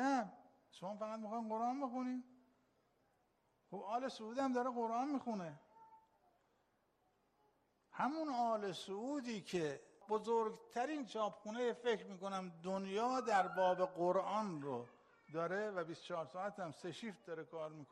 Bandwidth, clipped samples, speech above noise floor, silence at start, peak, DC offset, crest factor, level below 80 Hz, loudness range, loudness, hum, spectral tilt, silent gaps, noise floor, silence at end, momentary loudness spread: 11.5 kHz; under 0.1%; 38 dB; 0 s; -24 dBFS; under 0.1%; 20 dB; -86 dBFS; 7 LU; -42 LUFS; none; -5.5 dB/octave; none; -80 dBFS; 0.05 s; 12 LU